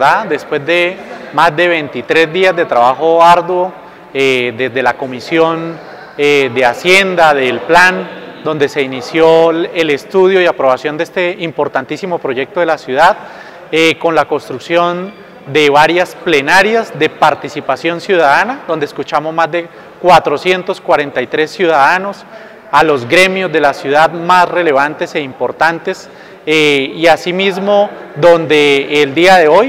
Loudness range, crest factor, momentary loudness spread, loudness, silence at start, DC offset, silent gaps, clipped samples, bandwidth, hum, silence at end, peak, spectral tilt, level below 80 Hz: 3 LU; 12 dB; 11 LU; -11 LUFS; 0 s; under 0.1%; none; 0.6%; 16 kHz; none; 0 s; 0 dBFS; -4.5 dB/octave; -50 dBFS